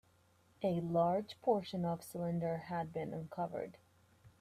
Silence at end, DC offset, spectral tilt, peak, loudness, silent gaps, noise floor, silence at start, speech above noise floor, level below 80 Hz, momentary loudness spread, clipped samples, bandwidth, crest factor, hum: 0.1 s; under 0.1%; -7.5 dB/octave; -20 dBFS; -38 LUFS; none; -70 dBFS; 0.6 s; 33 dB; -72 dBFS; 9 LU; under 0.1%; 15.5 kHz; 20 dB; none